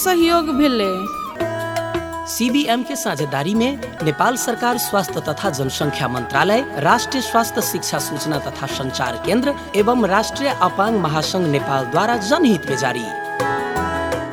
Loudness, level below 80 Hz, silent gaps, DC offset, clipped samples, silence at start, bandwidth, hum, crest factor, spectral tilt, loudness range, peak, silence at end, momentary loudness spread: -19 LUFS; -46 dBFS; none; under 0.1%; under 0.1%; 0 s; 18 kHz; none; 18 dB; -4 dB/octave; 2 LU; 0 dBFS; 0 s; 7 LU